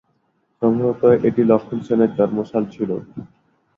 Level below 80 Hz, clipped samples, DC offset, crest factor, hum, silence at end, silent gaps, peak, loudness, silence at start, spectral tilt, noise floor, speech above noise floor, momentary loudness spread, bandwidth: -56 dBFS; under 0.1%; under 0.1%; 18 dB; none; 0.5 s; none; -2 dBFS; -19 LUFS; 0.6 s; -10 dB/octave; -66 dBFS; 48 dB; 11 LU; 6.8 kHz